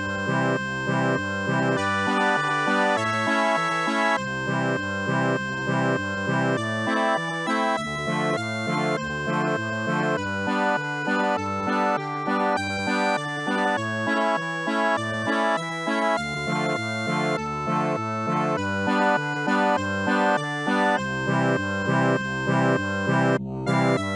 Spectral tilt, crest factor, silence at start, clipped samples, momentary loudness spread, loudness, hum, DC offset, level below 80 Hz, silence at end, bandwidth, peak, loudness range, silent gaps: -5.5 dB/octave; 14 dB; 0 s; under 0.1%; 4 LU; -24 LUFS; none; under 0.1%; -58 dBFS; 0 s; 11.5 kHz; -10 dBFS; 2 LU; none